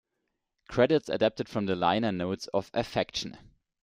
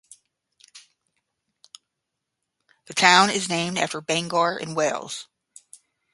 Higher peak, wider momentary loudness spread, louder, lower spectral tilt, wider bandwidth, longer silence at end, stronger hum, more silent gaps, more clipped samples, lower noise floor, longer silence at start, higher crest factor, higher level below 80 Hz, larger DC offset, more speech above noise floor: second, -10 dBFS vs 0 dBFS; second, 8 LU vs 15 LU; second, -29 LUFS vs -21 LUFS; first, -5.5 dB/octave vs -2.5 dB/octave; first, 15 kHz vs 11.5 kHz; second, 0.45 s vs 0.9 s; neither; neither; neither; about the same, -82 dBFS vs -82 dBFS; about the same, 0.7 s vs 0.75 s; second, 20 dB vs 26 dB; first, -60 dBFS vs -72 dBFS; neither; second, 53 dB vs 60 dB